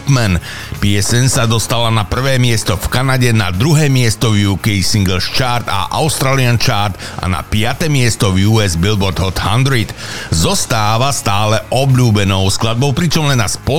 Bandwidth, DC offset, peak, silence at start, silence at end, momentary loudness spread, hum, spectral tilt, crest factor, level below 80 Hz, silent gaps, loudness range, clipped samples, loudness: 17 kHz; 6%; -2 dBFS; 0 s; 0 s; 5 LU; none; -4.5 dB/octave; 12 dB; -32 dBFS; none; 1 LU; under 0.1%; -13 LUFS